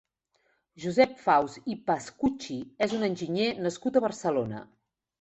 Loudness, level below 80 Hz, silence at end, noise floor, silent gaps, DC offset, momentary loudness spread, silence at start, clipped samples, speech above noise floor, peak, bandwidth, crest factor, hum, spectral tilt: -28 LUFS; -64 dBFS; 0.6 s; -73 dBFS; none; under 0.1%; 12 LU; 0.8 s; under 0.1%; 45 dB; -6 dBFS; 8.4 kHz; 22 dB; none; -5.5 dB/octave